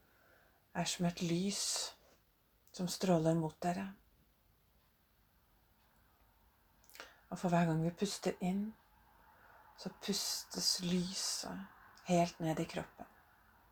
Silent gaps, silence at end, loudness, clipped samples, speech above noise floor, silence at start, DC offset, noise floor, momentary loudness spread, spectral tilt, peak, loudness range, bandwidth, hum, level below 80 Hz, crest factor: none; 0.65 s; -37 LUFS; under 0.1%; 36 dB; 0.75 s; under 0.1%; -73 dBFS; 19 LU; -4.5 dB/octave; -20 dBFS; 5 LU; over 20 kHz; none; -70 dBFS; 20 dB